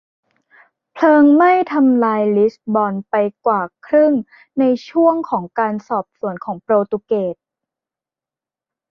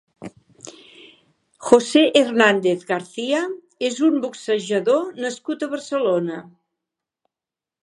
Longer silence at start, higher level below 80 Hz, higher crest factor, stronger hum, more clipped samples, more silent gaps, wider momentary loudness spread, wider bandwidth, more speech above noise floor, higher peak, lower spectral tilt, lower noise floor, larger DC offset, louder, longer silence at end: first, 0.95 s vs 0.2 s; about the same, -64 dBFS vs -68 dBFS; second, 16 dB vs 22 dB; neither; neither; neither; second, 12 LU vs 22 LU; second, 6.4 kHz vs 11 kHz; first, 74 dB vs 70 dB; about the same, -2 dBFS vs 0 dBFS; first, -8.5 dB/octave vs -4 dB/octave; about the same, -89 dBFS vs -89 dBFS; neither; first, -16 LUFS vs -20 LUFS; first, 1.6 s vs 1.4 s